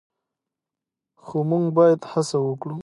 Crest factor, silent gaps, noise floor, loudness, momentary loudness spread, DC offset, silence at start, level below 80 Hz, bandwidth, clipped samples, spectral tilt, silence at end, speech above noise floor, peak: 18 dB; none; -87 dBFS; -21 LUFS; 10 LU; under 0.1%; 1.25 s; -72 dBFS; 11.5 kHz; under 0.1%; -7 dB/octave; 0 s; 67 dB; -6 dBFS